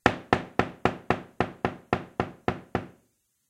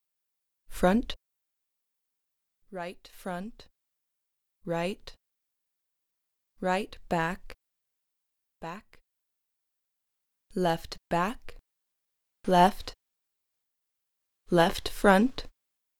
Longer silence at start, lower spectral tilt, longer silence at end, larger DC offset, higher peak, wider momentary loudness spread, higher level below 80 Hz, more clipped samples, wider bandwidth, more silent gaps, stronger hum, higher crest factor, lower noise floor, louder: second, 0.05 s vs 0.7 s; about the same, -6 dB/octave vs -5.5 dB/octave; about the same, 0.6 s vs 0.5 s; neither; first, -2 dBFS vs -8 dBFS; second, 8 LU vs 21 LU; about the same, -52 dBFS vs -50 dBFS; neither; second, 13.5 kHz vs 18 kHz; neither; neither; about the same, 28 dB vs 26 dB; second, -71 dBFS vs -82 dBFS; about the same, -30 LUFS vs -28 LUFS